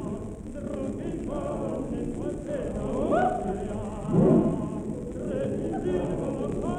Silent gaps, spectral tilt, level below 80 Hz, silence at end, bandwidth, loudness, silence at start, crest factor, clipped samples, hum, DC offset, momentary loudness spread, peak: none; -8.5 dB/octave; -42 dBFS; 0 s; 11 kHz; -29 LUFS; 0 s; 18 dB; under 0.1%; none; under 0.1%; 10 LU; -10 dBFS